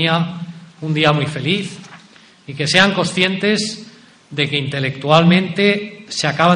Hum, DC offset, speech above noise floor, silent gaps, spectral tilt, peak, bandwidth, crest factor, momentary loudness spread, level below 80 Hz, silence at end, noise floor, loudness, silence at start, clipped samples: none; under 0.1%; 29 dB; none; -5 dB/octave; 0 dBFS; 10.5 kHz; 18 dB; 17 LU; -56 dBFS; 0 s; -45 dBFS; -16 LUFS; 0 s; under 0.1%